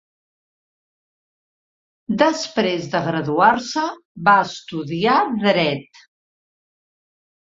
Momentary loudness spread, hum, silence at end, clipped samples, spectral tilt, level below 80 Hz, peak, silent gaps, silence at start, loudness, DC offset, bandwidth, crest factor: 11 LU; none; 1.75 s; under 0.1%; -5 dB/octave; -62 dBFS; 0 dBFS; 4.05-4.15 s; 2.1 s; -19 LUFS; under 0.1%; 7.8 kHz; 20 dB